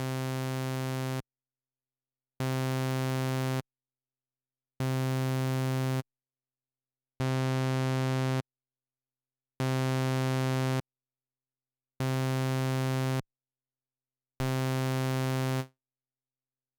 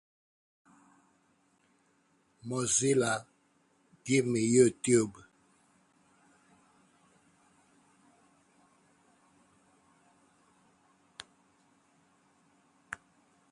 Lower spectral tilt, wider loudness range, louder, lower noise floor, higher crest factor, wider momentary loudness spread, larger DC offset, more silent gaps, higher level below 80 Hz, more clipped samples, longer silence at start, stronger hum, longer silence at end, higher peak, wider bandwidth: first, -6 dB/octave vs -4.5 dB/octave; second, 2 LU vs 20 LU; second, -31 LUFS vs -28 LUFS; first, under -90 dBFS vs -71 dBFS; second, 10 dB vs 24 dB; second, 7 LU vs 26 LU; neither; neither; first, -68 dBFS vs -74 dBFS; neither; second, 0 s vs 2.45 s; neither; first, 1.1 s vs 0.55 s; second, -22 dBFS vs -12 dBFS; first, over 20 kHz vs 11.5 kHz